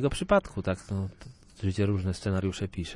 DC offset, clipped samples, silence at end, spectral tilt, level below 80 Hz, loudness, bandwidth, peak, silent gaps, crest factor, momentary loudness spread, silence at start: under 0.1%; under 0.1%; 0 s; -6.5 dB/octave; -48 dBFS; -30 LUFS; 11 kHz; -12 dBFS; none; 18 dB; 9 LU; 0 s